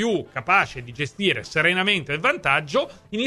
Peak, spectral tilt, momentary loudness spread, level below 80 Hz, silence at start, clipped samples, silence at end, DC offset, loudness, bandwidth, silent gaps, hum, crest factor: -4 dBFS; -4.5 dB/octave; 9 LU; -54 dBFS; 0 s; under 0.1%; 0 s; under 0.1%; -21 LUFS; 13 kHz; none; none; 18 dB